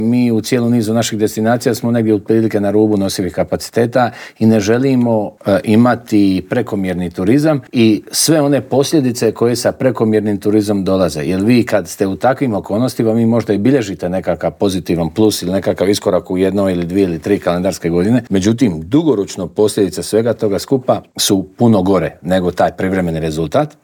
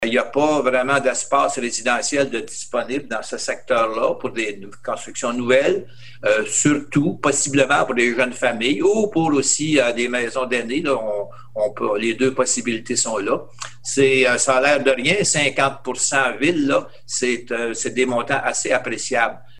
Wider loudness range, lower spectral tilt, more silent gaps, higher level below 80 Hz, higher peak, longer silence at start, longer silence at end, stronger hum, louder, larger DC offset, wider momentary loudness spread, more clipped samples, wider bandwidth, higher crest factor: about the same, 2 LU vs 4 LU; first, -5.5 dB/octave vs -3 dB/octave; neither; first, -50 dBFS vs -58 dBFS; about the same, 0 dBFS vs -2 dBFS; about the same, 0 s vs 0 s; about the same, 0.15 s vs 0.2 s; neither; first, -14 LUFS vs -19 LUFS; second, under 0.1% vs 1%; second, 5 LU vs 9 LU; neither; first, over 20 kHz vs 12 kHz; second, 12 dB vs 18 dB